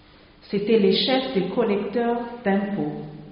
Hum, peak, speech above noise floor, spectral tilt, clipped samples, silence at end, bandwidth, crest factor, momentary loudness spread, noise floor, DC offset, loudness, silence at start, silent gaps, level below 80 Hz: none; -8 dBFS; 28 dB; -4 dB/octave; under 0.1%; 0 s; 5.4 kHz; 16 dB; 10 LU; -50 dBFS; under 0.1%; -23 LUFS; 0.45 s; none; -56 dBFS